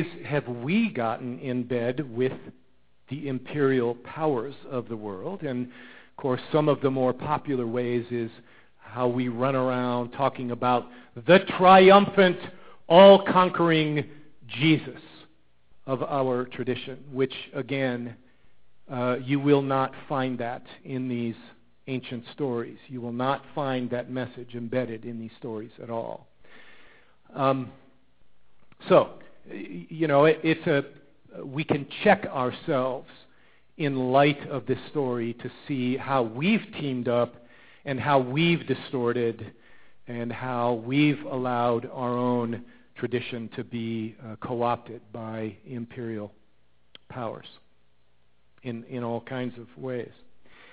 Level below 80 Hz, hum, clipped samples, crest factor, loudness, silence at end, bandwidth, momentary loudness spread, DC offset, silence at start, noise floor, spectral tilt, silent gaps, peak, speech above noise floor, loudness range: -64 dBFS; none; under 0.1%; 24 dB; -25 LUFS; 0.7 s; 4 kHz; 17 LU; 0.3%; 0 s; -69 dBFS; -10.5 dB/octave; none; -2 dBFS; 43 dB; 14 LU